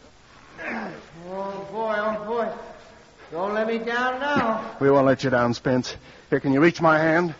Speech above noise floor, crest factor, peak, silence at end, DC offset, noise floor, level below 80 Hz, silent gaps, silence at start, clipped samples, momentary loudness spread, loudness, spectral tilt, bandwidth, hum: 29 dB; 20 dB; -4 dBFS; 0.05 s; under 0.1%; -50 dBFS; -56 dBFS; none; 0.55 s; under 0.1%; 18 LU; -23 LUFS; -4.5 dB/octave; 7.6 kHz; none